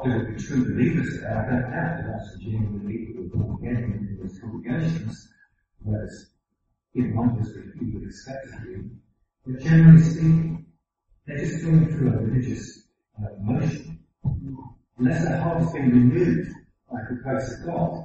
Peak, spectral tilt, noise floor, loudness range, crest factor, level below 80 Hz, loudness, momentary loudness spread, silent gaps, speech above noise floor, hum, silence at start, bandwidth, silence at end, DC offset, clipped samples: -2 dBFS; -9 dB/octave; -76 dBFS; 11 LU; 22 dB; -44 dBFS; -23 LUFS; 18 LU; none; 53 dB; none; 0 s; 7.6 kHz; 0 s; under 0.1%; under 0.1%